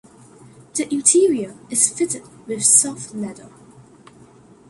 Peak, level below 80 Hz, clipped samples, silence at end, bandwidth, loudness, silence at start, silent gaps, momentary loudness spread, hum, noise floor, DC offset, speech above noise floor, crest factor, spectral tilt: 0 dBFS; -64 dBFS; under 0.1%; 1.2 s; 12 kHz; -17 LUFS; 0.75 s; none; 17 LU; none; -47 dBFS; under 0.1%; 28 dB; 22 dB; -2.5 dB/octave